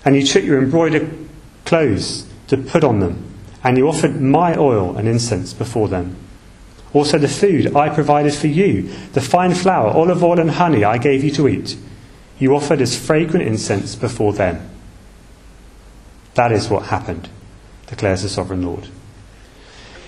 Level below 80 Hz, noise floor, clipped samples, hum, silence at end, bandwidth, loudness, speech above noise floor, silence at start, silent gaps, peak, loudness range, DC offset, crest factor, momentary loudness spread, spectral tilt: -42 dBFS; -42 dBFS; under 0.1%; none; 0 s; 13 kHz; -16 LUFS; 26 dB; 0 s; none; 0 dBFS; 7 LU; under 0.1%; 16 dB; 11 LU; -6 dB/octave